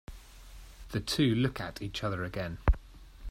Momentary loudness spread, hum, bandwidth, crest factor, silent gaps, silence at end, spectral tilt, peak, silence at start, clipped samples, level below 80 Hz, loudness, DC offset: 24 LU; none; 16 kHz; 20 dB; none; 0 s; -5.5 dB/octave; -12 dBFS; 0.1 s; under 0.1%; -38 dBFS; -32 LUFS; under 0.1%